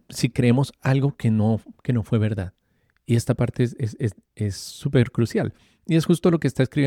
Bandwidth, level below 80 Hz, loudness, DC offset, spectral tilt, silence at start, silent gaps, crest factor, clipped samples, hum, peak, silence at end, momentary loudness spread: 14.5 kHz; -52 dBFS; -23 LUFS; under 0.1%; -7 dB/octave; 0.1 s; none; 16 dB; under 0.1%; none; -6 dBFS; 0 s; 9 LU